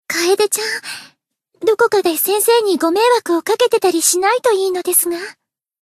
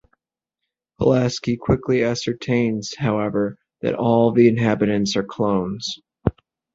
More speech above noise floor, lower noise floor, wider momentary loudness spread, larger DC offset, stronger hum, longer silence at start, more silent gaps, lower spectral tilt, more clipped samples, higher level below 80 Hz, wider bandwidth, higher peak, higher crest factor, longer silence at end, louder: second, 42 dB vs 64 dB; second, -57 dBFS vs -83 dBFS; about the same, 9 LU vs 10 LU; neither; neither; second, 0.1 s vs 1 s; neither; second, -1 dB/octave vs -6 dB/octave; neither; second, -66 dBFS vs -44 dBFS; first, 14 kHz vs 7.8 kHz; about the same, 0 dBFS vs -2 dBFS; about the same, 16 dB vs 18 dB; about the same, 0.5 s vs 0.45 s; first, -15 LUFS vs -21 LUFS